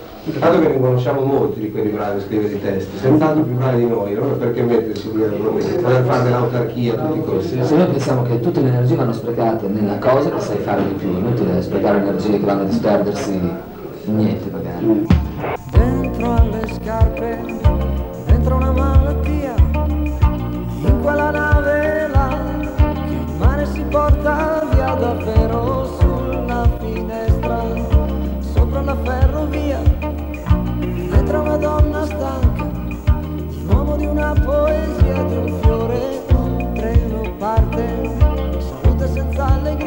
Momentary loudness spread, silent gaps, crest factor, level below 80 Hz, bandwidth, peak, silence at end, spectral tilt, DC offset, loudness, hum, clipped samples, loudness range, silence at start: 6 LU; none; 16 dB; -22 dBFS; 16.5 kHz; 0 dBFS; 0 s; -8.5 dB/octave; under 0.1%; -18 LUFS; none; under 0.1%; 2 LU; 0 s